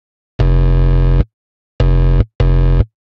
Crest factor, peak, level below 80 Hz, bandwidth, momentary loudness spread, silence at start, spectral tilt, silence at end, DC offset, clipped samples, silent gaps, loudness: 12 dB; 0 dBFS; -14 dBFS; 4.9 kHz; 5 LU; 0.4 s; -9.5 dB/octave; 0.35 s; under 0.1%; under 0.1%; 1.33-1.79 s, 2.35-2.39 s; -15 LUFS